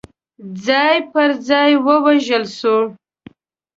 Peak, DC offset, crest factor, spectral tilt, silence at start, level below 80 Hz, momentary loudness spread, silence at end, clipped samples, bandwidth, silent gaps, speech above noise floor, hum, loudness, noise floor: -2 dBFS; under 0.1%; 16 dB; -4.5 dB/octave; 0.4 s; -62 dBFS; 9 LU; 0.85 s; under 0.1%; 7.8 kHz; none; 30 dB; none; -15 LUFS; -45 dBFS